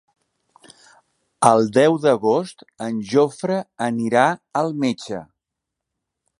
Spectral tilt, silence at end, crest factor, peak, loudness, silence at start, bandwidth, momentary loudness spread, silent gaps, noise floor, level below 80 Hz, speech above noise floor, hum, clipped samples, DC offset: -5.5 dB/octave; 1.15 s; 20 dB; 0 dBFS; -19 LUFS; 1.4 s; 11.5 kHz; 13 LU; none; -83 dBFS; -66 dBFS; 64 dB; none; under 0.1%; under 0.1%